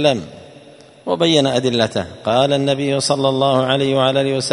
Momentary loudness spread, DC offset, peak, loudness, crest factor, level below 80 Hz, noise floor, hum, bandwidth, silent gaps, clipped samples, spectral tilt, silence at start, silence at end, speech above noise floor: 8 LU; under 0.1%; 0 dBFS; -16 LUFS; 16 dB; -54 dBFS; -43 dBFS; none; 11 kHz; none; under 0.1%; -5 dB/octave; 0 s; 0 s; 26 dB